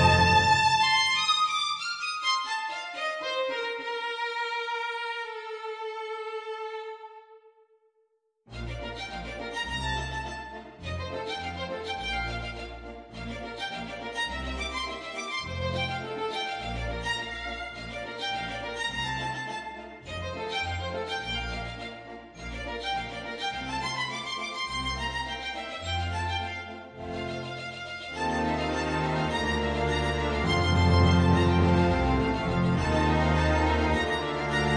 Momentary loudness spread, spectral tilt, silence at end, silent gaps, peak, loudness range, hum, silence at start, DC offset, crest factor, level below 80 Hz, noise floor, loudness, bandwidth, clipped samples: 15 LU; -5 dB/octave; 0 s; none; -10 dBFS; 11 LU; none; 0 s; under 0.1%; 20 dB; -40 dBFS; -72 dBFS; -29 LUFS; 10 kHz; under 0.1%